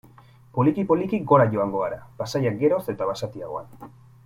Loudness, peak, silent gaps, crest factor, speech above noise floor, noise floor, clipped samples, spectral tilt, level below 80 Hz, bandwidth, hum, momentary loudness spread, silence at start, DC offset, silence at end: -23 LUFS; -4 dBFS; none; 20 dB; 28 dB; -51 dBFS; under 0.1%; -7.5 dB/octave; -58 dBFS; 16 kHz; none; 15 LU; 0.55 s; under 0.1%; 0.4 s